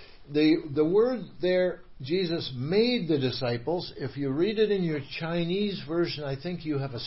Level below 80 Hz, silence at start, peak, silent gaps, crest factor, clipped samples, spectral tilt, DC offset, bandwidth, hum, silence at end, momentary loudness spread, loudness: -54 dBFS; 0 s; -12 dBFS; none; 16 dB; under 0.1%; -10 dB/octave; 0.3%; 5.8 kHz; none; 0 s; 8 LU; -28 LUFS